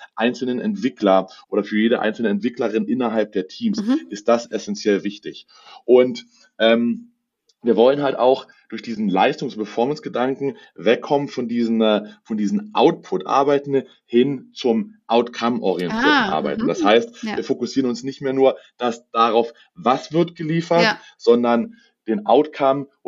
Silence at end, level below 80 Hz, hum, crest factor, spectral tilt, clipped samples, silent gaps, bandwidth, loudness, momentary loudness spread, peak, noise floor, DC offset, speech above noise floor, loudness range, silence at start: 0.2 s; -64 dBFS; none; 18 dB; -5.5 dB/octave; under 0.1%; none; 7.6 kHz; -20 LUFS; 10 LU; -2 dBFS; -66 dBFS; under 0.1%; 47 dB; 2 LU; 0 s